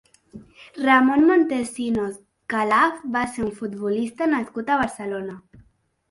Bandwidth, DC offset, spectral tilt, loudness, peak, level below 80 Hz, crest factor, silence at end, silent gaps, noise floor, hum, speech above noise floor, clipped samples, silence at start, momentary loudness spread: 11.5 kHz; under 0.1%; -5 dB/octave; -22 LUFS; -4 dBFS; -56 dBFS; 20 dB; 0.7 s; none; -45 dBFS; none; 24 dB; under 0.1%; 0.35 s; 14 LU